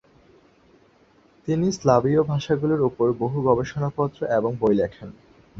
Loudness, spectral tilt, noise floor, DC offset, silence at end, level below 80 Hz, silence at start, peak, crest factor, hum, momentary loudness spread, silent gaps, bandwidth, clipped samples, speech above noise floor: -22 LUFS; -7.5 dB/octave; -57 dBFS; under 0.1%; 0 s; -52 dBFS; 1.45 s; -2 dBFS; 20 dB; none; 8 LU; none; 7.8 kHz; under 0.1%; 35 dB